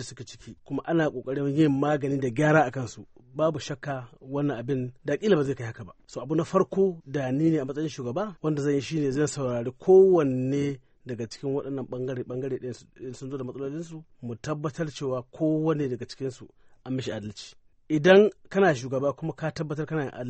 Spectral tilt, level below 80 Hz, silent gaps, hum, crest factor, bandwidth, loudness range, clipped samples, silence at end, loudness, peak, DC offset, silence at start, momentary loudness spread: -6.5 dB/octave; -62 dBFS; none; none; 22 dB; 8.4 kHz; 9 LU; under 0.1%; 0 s; -26 LUFS; -6 dBFS; under 0.1%; 0 s; 18 LU